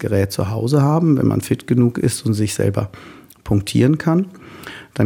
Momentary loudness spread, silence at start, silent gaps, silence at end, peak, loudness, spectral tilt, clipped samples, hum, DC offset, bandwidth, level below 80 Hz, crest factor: 15 LU; 0 s; none; 0 s; -2 dBFS; -18 LUFS; -6.5 dB/octave; under 0.1%; none; under 0.1%; 17.5 kHz; -46 dBFS; 16 dB